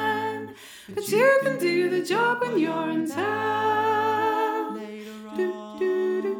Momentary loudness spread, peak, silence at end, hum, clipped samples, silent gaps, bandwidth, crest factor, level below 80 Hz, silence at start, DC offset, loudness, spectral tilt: 14 LU; -8 dBFS; 0 s; none; under 0.1%; none; over 20 kHz; 16 dB; -74 dBFS; 0 s; under 0.1%; -24 LUFS; -4.5 dB/octave